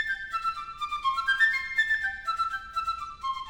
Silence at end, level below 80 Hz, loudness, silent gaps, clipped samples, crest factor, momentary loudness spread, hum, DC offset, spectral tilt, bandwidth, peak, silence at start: 0 s; -56 dBFS; -27 LUFS; none; under 0.1%; 18 dB; 10 LU; none; under 0.1%; 0 dB/octave; 17.5 kHz; -12 dBFS; 0 s